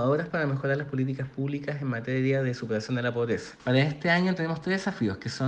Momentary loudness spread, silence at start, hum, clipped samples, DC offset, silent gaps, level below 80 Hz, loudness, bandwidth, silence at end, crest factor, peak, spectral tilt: 7 LU; 0 s; none; under 0.1%; under 0.1%; none; -62 dBFS; -28 LUFS; 9 kHz; 0 s; 18 dB; -10 dBFS; -7 dB/octave